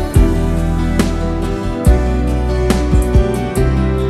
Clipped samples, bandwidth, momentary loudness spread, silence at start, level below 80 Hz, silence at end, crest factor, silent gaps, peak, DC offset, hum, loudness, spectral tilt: under 0.1%; 13.5 kHz; 4 LU; 0 s; -16 dBFS; 0 s; 14 dB; none; 0 dBFS; under 0.1%; none; -15 LUFS; -7 dB/octave